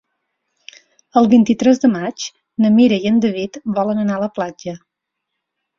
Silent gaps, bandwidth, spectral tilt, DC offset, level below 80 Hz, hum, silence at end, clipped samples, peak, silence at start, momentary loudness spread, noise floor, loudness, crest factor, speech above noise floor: none; 7.4 kHz; -6 dB/octave; under 0.1%; -58 dBFS; none; 1 s; under 0.1%; -2 dBFS; 1.15 s; 15 LU; -78 dBFS; -16 LUFS; 16 dB; 63 dB